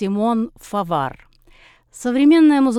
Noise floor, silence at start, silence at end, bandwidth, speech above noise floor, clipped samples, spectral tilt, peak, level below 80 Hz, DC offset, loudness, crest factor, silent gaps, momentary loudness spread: -50 dBFS; 0 s; 0 s; 12.5 kHz; 33 dB; under 0.1%; -6 dB/octave; -4 dBFS; -52 dBFS; under 0.1%; -18 LUFS; 12 dB; none; 14 LU